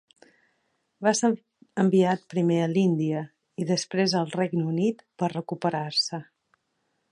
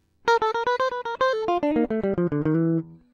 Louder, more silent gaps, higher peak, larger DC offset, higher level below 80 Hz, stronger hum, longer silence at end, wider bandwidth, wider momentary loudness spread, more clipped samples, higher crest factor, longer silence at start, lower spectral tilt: about the same, -26 LUFS vs -24 LUFS; neither; about the same, -8 dBFS vs -8 dBFS; neither; second, -74 dBFS vs -52 dBFS; neither; first, 0.9 s vs 0.2 s; first, 11 kHz vs 7.4 kHz; first, 9 LU vs 3 LU; neither; about the same, 18 dB vs 14 dB; first, 1 s vs 0.25 s; second, -5.5 dB/octave vs -7 dB/octave